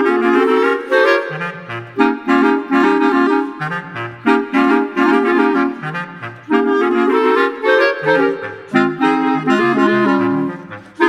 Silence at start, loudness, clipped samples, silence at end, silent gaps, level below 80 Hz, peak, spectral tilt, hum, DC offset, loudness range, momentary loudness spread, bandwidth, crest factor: 0 s; -15 LUFS; under 0.1%; 0 s; none; -60 dBFS; 0 dBFS; -6.5 dB/octave; none; under 0.1%; 2 LU; 11 LU; 10 kHz; 14 dB